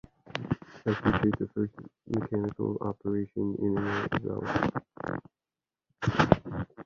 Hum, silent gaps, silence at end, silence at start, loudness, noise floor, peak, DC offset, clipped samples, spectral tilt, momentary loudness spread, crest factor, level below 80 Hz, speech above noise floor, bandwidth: none; none; 0.05 s; 0.25 s; -31 LUFS; under -90 dBFS; -2 dBFS; under 0.1%; under 0.1%; -7.5 dB/octave; 11 LU; 28 dB; -50 dBFS; over 60 dB; 7.4 kHz